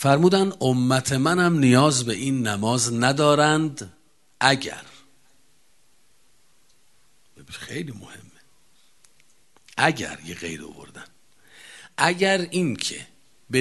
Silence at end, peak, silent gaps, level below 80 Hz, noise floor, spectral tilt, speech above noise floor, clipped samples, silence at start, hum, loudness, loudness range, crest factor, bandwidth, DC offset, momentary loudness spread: 0 s; 0 dBFS; none; -58 dBFS; -64 dBFS; -4.5 dB/octave; 42 dB; under 0.1%; 0 s; none; -21 LUFS; 21 LU; 24 dB; 12.5 kHz; 0.2%; 21 LU